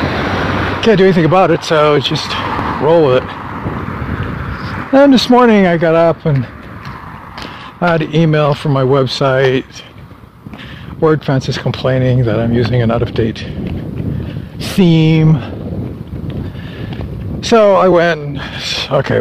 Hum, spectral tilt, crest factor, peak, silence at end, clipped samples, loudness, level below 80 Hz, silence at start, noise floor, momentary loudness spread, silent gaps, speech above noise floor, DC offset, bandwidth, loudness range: none; -7 dB/octave; 12 dB; 0 dBFS; 0 s; under 0.1%; -13 LUFS; -34 dBFS; 0 s; -35 dBFS; 17 LU; none; 24 dB; under 0.1%; 14 kHz; 4 LU